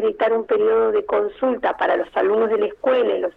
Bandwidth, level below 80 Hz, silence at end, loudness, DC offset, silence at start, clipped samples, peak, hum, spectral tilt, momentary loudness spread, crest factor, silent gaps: 4.1 kHz; -56 dBFS; 0.05 s; -20 LUFS; under 0.1%; 0 s; under 0.1%; -8 dBFS; none; -6.5 dB/octave; 3 LU; 12 dB; none